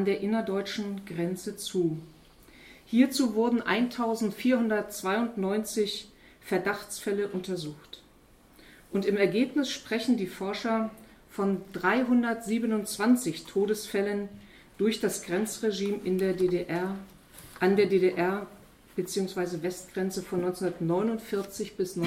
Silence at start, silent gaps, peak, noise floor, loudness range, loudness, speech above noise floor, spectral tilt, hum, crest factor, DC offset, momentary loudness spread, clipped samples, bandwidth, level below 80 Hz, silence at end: 0 s; none; -10 dBFS; -58 dBFS; 4 LU; -29 LUFS; 29 dB; -5 dB/octave; none; 18 dB; under 0.1%; 10 LU; under 0.1%; 16 kHz; -62 dBFS; 0 s